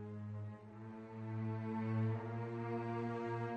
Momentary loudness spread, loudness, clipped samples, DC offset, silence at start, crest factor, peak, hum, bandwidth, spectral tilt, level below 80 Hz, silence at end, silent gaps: 12 LU; -43 LUFS; under 0.1%; under 0.1%; 0 s; 14 dB; -28 dBFS; none; 5.8 kHz; -9.5 dB/octave; -76 dBFS; 0 s; none